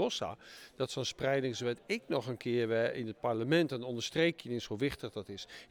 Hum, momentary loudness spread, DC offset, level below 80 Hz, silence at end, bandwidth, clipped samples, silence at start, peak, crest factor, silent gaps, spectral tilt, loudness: none; 12 LU; under 0.1%; -66 dBFS; 0.05 s; 18 kHz; under 0.1%; 0 s; -18 dBFS; 18 dB; none; -5 dB/octave; -35 LUFS